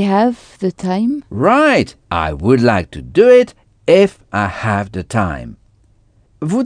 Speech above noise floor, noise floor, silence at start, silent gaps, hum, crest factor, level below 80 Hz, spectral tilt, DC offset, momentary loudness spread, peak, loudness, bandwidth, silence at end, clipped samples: 38 dB; -52 dBFS; 0 s; none; none; 14 dB; -40 dBFS; -6.5 dB/octave; under 0.1%; 12 LU; 0 dBFS; -15 LUFS; 10 kHz; 0 s; under 0.1%